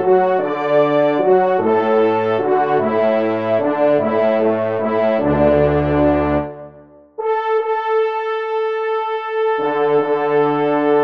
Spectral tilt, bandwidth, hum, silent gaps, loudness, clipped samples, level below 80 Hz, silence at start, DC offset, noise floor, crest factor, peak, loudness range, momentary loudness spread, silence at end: -9 dB/octave; 5.6 kHz; none; none; -16 LUFS; under 0.1%; -40 dBFS; 0 s; 0.3%; -43 dBFS; 14 dB; -2 dBFS; 4 LU; 6 LU; 0 s